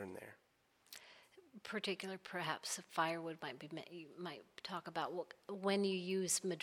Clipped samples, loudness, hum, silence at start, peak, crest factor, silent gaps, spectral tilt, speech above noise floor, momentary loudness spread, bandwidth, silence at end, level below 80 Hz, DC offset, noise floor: under 0.1%; -42 LUFS; none; 0 s; -22 dBFS; 20 dB; none; -3 dB/octave; 34 dB; 19 LU; 17 kHz; 0 s; -88 dBFS; under 0.1%; -76 dBFS